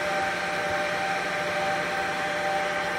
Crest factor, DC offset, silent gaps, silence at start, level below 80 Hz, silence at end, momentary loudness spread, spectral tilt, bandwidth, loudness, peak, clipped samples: 12 dB; under 0.1%; none; 0 s; -58 dBFS; 0 s; 1 LU; -3 dB/octave; 16 kHz; -27 LUFS; -16 dBFS; under 0.1%